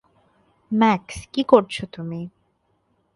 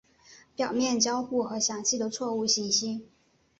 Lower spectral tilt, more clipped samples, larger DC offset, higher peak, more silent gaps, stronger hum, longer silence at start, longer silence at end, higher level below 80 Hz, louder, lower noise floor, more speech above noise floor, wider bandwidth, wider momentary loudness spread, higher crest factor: first, -6 dB/octave vs -2 dB/octave; neither; neither; first, 0 dBFS vs -12 dBFS; neither; neither; first, 0.7 s vs 0.3 s; first, 0.85 s vs 0.55 s; first, -54 dBFS vs -70 dBFS; first, -21 LUFS vs -27 LUFS; first, -67 dBFS vs -56 dBFS; first, 47 dB vs 28 dB; first, 11.5 kHz vs 8.2 kHz; first, 15 LU vs 9 LU; about the same, 22 dB vs 18 dB